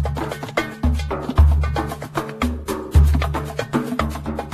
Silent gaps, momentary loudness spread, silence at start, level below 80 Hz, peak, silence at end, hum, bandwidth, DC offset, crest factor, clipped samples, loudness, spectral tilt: none; 10 LU; 0 s; -22 dBFS; -2 dBFS; 0 s; none; 14 kHz; under 0.1%; 18 dB; under 0.1%; -21 LUFS; -7 dB/octave